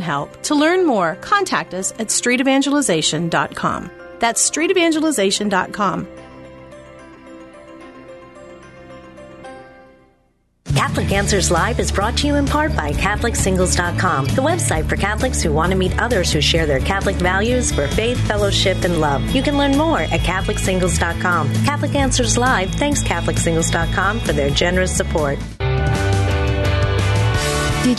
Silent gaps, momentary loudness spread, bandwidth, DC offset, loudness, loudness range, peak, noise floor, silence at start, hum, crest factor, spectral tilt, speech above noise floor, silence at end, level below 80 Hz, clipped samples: none; 5 LU; 12.5 kHz; under 0.1%; -17 LUFS; 4 LU; -2 dBFS; -60 dBFS; 0 s; none; 16 dB; -4.5 dB/octave; 43 dB; 0 s; -28 dBFS; under 0.1%